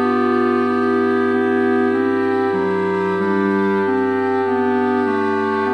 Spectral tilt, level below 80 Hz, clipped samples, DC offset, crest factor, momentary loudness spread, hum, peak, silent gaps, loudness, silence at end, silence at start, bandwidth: -7.5 dB/octave; -68 dBFS; under 0.1%; under 0.1%; 10 dB; 2 LU; none; -6 dBFS; none; -18 LUFS; 0 s; 0 s; 8.4 kHz